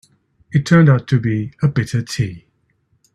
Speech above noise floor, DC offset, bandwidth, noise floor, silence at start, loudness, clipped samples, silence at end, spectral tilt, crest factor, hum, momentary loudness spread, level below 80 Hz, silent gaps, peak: 47 dB; under 0.1%; 12 kHz; -63 dBFS; 0.5 s; -17 LUFS; under 0.1%; 0.75 s; -7 dB/octave; 16 dB; none; 11 LU; -48 dBFS; none; 0 dBFS